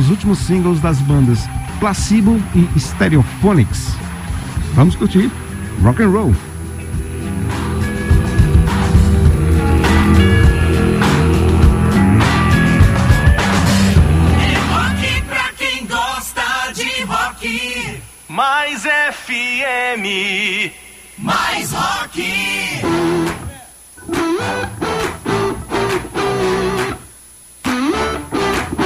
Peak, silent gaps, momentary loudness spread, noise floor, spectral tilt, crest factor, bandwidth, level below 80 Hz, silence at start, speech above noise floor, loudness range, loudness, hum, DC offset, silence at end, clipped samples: 0 dBFS; none; 10 LU; -41 dBFS; -5.5 dB/octave; 14 dB; 15.5 kHz; -22 dBFS; 0 s; 27 dB; 7 LU; -15 LUFS; none; under 0.1%; 0 s; under 0.1%